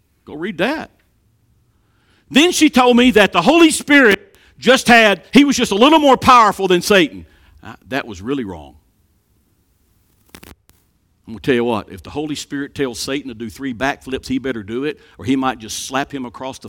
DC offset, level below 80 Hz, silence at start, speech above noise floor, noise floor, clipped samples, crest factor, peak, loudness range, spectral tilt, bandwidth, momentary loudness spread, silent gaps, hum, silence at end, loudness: under 0.1%; -48 dBFS; 0.3 s; 45 dB; -60 dBFS; under 0.1%; 16 dB; 0 dBFS; 17 LU; -3.5 dB/octave; 17.5 kHz; 17 LU; none; none; 0 s; -14 LUFS